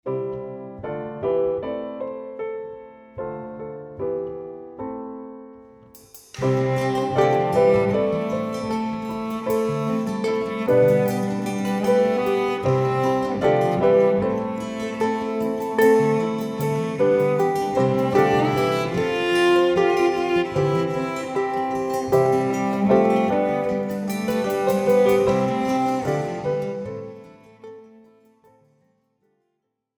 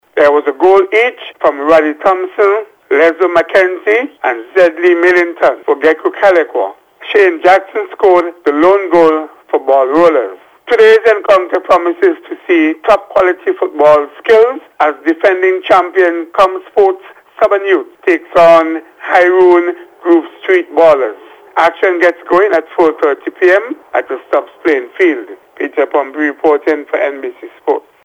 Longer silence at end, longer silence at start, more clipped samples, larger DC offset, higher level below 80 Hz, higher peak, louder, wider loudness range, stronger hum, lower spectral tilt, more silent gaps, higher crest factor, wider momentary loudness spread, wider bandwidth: first, 2.1 s vs 0.25 s; about the same, 0.05 s vs 0.15 s; second, under 0.1% vs 0.7%; neither; about the same, -54 dBFS vs -52 dBFS; second, -4 dBFS vs 0 dBFS; second, -22 LUFS vs -11 LUFS; first, 11 LU vs 3 LU; neither; first, -6.5 dB/octave vs -5 dB/octave; neither; first, 18 dB vs 10 dB; first, 15 LU vs 9 LU; first, over 20 kHz vs 9.2 kHz